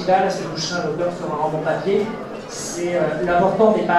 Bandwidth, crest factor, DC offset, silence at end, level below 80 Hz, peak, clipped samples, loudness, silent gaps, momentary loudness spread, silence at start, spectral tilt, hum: 13 kHz; 16 dB; under 0.1%; 0 s; -50 dBFS; -2 dBFS; under 0.1%; -21 LUFS; none; 11 LU; 0 s; -5 dB/octave; none